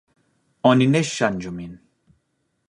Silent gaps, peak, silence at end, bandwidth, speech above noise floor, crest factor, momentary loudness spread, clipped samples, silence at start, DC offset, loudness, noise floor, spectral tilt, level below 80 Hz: none; -2 dBFS; 0.95 s; 11 kHz; 52 dB; 20 dB; 18 LU; under 0.1%; 0.65 s; under 0.1%; -20 LUFS; -72 dBFS; -5.5 dB/octave; -56 dBFS